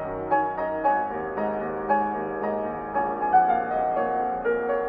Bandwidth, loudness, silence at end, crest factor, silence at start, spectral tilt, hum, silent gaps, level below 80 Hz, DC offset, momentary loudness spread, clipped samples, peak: 4.9 kHz; -25 LUFS; 0 s; 16 dB; 0 s; -9 dB/octave; none; none; -54 dBFS; under 0.1%; 7 LU; under 0.1%; -8 dBFS